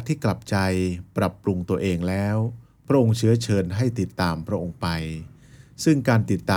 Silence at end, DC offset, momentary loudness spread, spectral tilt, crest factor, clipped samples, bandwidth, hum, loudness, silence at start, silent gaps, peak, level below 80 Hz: 0 s; under 0.1%; 8 LU; -6.5 dB/octave; 16 dB; under 0.1%; 17 kHz; none; -24 LUFS; 0 s; none; -6 dBFS; -52 dBFS